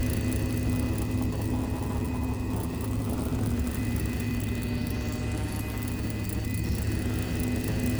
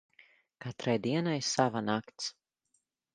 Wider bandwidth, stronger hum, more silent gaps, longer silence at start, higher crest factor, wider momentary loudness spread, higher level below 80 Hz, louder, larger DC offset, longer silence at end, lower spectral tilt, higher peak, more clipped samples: first, over 20 kHz vs 10 kHz; neither; neither; second, 0 s vs 0.6 s; second, 14 dB vs 24 dB; second, 3 LU vs 11 LU; first, -36 dBFS vs -74 dBFS; about the same, -30 LUFS vs -32 LUFS; neither; second, 0 s vs 0.85 s; first, -6.5 dB/octave vs -4.5 dB/octave; second, -16 dBFS vs -10 dBFS; neither